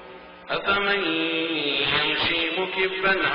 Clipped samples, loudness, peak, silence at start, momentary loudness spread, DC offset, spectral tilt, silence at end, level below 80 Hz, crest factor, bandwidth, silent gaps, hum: under 0.1%; -22 LUFS; -10 dBFS; 0 s; 7 LU; under 0.1%; -0.5 dB/octave; 0 s; -54 dBFS; 16 dB; 5.4 kHz; none; none